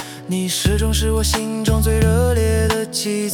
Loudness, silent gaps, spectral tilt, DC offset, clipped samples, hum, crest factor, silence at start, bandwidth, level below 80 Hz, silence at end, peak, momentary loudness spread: -18 LUFS; none; -5 dB/octave; under 0.1%; under 0.1%; none; 14 dB; 0 s; 18 kHz; -24 dBFS; 0 s; -2 dBFS; 5 LU